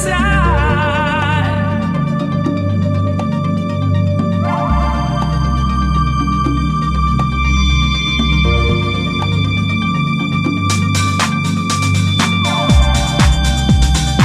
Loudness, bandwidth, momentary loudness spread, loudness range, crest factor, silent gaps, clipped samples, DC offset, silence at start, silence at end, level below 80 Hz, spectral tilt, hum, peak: -15 LUFS; 13 kHz; 4 LU; 2 LU; 14 dB; none; under 0.1%; under 0.1%; 0 s; 0 s; -20 dBFS; -5.5 dB/octave; none; 0 dBFS